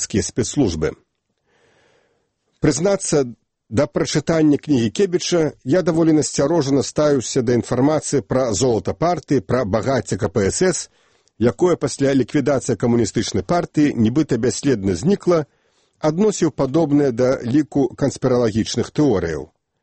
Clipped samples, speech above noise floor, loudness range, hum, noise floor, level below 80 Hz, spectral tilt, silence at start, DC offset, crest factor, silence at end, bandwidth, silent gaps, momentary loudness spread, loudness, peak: under 0.1%; 49 dB; 3 LU; none; -67 dBFS; -46 dBFS; -5.5 dB/octave; 0 s; under 0.1%; 16 dB; 0.4 s; 8.8 kHz; none; 5 LU; -19 LUFS; -2 dBFS